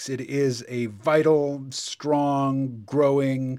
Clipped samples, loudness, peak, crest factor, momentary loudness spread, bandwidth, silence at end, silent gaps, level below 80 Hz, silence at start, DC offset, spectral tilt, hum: under 0.1%; -24 LUFS; -6 dBFS; 16 dB; 9 LU; 13.5 kHz; 0 s; none; -70 dBFS; 0 s; under 0.1%; -6 dB/octave; none